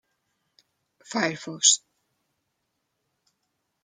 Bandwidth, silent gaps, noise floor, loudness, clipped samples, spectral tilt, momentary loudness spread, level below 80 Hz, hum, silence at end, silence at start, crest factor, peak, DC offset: 12 kHz; none; -78 dBFS; -22 LUFS; under 0.1%; -0.5 dB/octave; 10 LU; -80 dBFS; none; 2.05 s; 1.1 s; 26 dB; -4 dBFS; under 0.1%